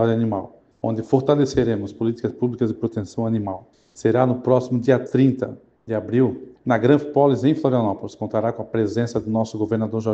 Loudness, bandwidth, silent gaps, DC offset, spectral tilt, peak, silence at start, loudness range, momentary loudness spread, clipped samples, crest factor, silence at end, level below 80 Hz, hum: -21 LUFS; 8.2 kHz; none; under 0.1%; -8 dB/octave; -2 dBFS; 0 s; 3 LU; 11 LU; under 0.1%; 18 dB; 0 s; -54 dBFS; none